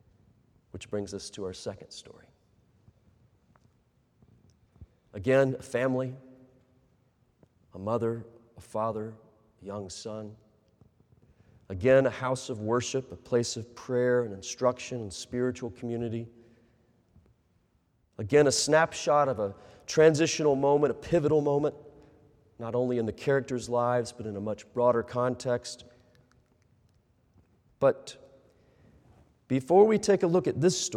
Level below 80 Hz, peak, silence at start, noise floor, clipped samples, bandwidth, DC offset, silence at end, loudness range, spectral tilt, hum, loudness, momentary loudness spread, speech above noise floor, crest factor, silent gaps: -64 dBFS; -8 dBFS; 0.75 s; -70 dBFS; under 0.1%; 14 kHz; under 0.1%; 0 s; 12 LU; -5 dB/octave; none; -28 LUFS; 18 LU; 42 dB; 22 dB; none